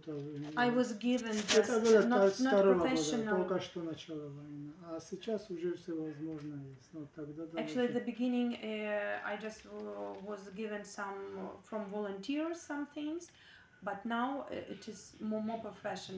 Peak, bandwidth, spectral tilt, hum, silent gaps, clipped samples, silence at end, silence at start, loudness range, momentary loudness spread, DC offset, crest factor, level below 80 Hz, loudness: -14 dBFS; 8 kHz; -4.5 dB/octave; none; none; under 0.1%; 0 s; 0.05 s; 12 LU; 18 LU; under 0.1%; 22 dB; -72 dBFS; -35 LUFS